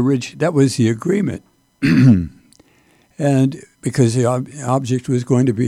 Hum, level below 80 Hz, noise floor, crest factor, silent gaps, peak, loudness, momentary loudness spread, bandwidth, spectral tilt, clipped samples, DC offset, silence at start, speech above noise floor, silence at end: none; -48 dBFS; -55 dBFS; 14 dB; none; -2 dBFS; -17 LUFS; 10 LU; 12.5 kHz; -7 dB/octave; under 0.1%; under 0.1%; 0 s; 39 dB; 0 s